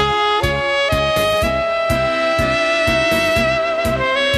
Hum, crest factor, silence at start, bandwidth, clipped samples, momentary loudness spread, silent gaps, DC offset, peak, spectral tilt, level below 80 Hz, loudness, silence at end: none; 16 dB; 0 s; 14 kHz; under 0.1%; 3 LU; none; under 0.1%; 0 dBFS; -4 dB/octave; -32 dBFS; -16 LUFS; 0 s